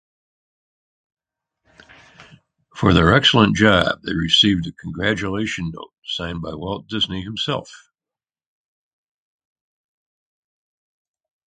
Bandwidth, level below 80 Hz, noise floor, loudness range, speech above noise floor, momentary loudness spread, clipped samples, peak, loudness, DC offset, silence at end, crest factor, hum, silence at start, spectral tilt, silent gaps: 9.4 kHz; -40 dBFS; under -90 dBFS; 12 LU; over 71 dB; 15 LU; under 0.1%; 0 dBFS; -18 LUFS; under 0.1%; 3.7 s; 22 dB; none; 2.2 s; -5 dB/octave; 5.98-6.02 s